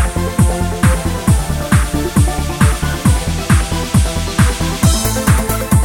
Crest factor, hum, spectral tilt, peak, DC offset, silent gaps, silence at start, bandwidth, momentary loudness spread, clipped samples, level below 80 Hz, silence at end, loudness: 14 dB; none; -5 dB/octave; 0 dBFS; under 0.1%; none; 0 s; 19.5 kHz; 2 LU; under 0.1%; -18 dBFS; 0 s; -15 LUFS